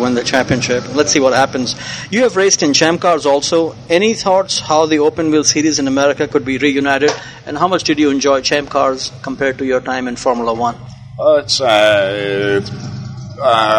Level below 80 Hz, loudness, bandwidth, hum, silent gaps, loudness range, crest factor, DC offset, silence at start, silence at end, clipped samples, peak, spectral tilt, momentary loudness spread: -46 dBFS; -14 LUFS; 11 kHz; none; none; 3 LU; 14 dB; under 0.1%; 0 s; 0 s; under 0.1%; 0 dBFS; -3.5 dB/octave; 9 LU